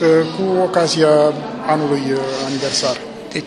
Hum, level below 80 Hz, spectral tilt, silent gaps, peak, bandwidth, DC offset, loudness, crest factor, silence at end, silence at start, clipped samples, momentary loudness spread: none; -56 dBFS; -4.5 dB/octave; none; -2 dBFS; 12 kHz; under 0.1%; -17 LUFS; 16 dB; 0 s; 0 s; under 0.1%; 8 LU